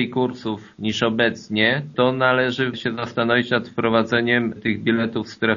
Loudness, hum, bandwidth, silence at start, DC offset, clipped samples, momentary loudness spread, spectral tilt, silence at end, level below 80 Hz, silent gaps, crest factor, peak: -21 LUFS; none; 7.2 kHz; 0 s; under 0.1%; under 0.1%; 7 LU; -3.5 dB/octave; 0 s; -58 dBFS; none; 18 dB; -4 dBFS